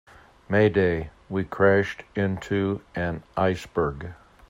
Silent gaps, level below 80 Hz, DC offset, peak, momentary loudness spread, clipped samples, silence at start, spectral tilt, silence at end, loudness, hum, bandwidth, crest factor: none; -50 dBFS; under 0.1%; -6 dBFS; 11 LU; under 0.1%; 0.5 s; -7.5 dB/octave; 0.35 s; -25 LUFS; none; 15.5 kHz; 18 dB